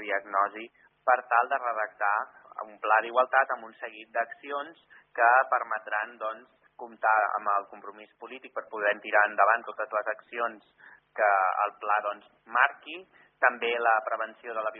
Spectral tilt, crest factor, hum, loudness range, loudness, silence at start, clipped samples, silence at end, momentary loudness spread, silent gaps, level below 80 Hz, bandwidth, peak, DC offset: 1.5 dB/octave; 22 dB; none; 2 LU; -27 LUFS; 0 s; under 0.1%; 0 s; 19 LU; none; -90 dBFS; 3.9 kHz; -6 dBFS; under 0.1%